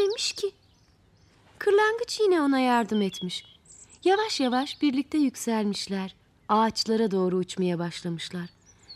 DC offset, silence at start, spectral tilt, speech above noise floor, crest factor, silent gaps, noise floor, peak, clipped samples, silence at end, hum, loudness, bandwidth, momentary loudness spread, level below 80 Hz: under 0.1%; 0 s; -4.5 dB/octave; 35 dB; 16 dB; none; -61 dBFS; -10 dBFS; under 0.1%; 0 s; none; -26 LUFS; 14.5 kHz; 11 LU; -66 dBFS